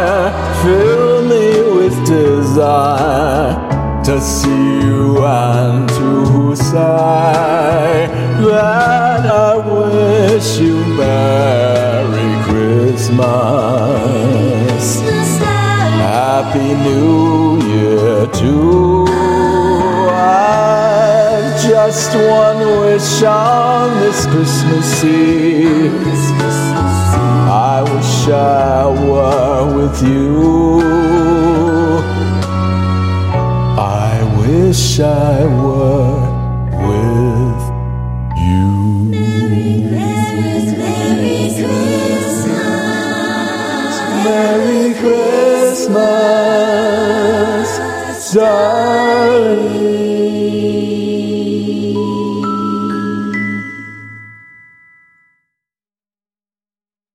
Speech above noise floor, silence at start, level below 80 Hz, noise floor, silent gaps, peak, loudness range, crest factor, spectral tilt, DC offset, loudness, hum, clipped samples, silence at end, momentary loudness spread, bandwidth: over 80 dB; 0 s; -30 dBFS; under -90 dBFS; none; 0 dBFS; 4 LU; 12 dB; -6 dB/octave; 0.1%; -12 LUFS; none; under 0.1%; 2.8 s; 6 LU; 16 kHz